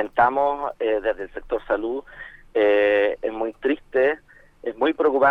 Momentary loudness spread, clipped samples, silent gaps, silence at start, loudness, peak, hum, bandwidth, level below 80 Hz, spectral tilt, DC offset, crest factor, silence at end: 14 LU; under 0.1%; none; 0 s; -22 LUFS; -4 dBFS; none; 4.9 kHz; -50 dBFS; -6.5 dB/octave; under 0.1%; 18 dB; 0 s